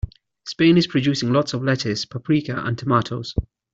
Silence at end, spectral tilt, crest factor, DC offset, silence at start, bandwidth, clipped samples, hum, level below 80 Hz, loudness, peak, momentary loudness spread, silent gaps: 0.3 s; -6 dB/octave; 18 dB; under 0.1%; 0.05 s; 7.8 kHz; under 0.1%; none; -40 dBFS; -21 LUFS; -4 dBFS; 13 LU; none